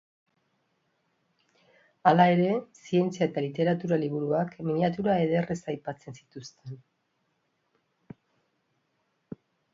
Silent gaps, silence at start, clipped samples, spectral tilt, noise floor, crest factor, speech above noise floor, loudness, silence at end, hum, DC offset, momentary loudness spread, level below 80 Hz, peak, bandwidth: none; 2.05 s; under 0.1%; -7.5 dB/octave; -75 dBFS; 24 dB; 49 dB; -27 LUFS; 2.95 s; none; under 0.1%; 24 LU; -68 dBFS; -4 dBFS; 7.6 kHz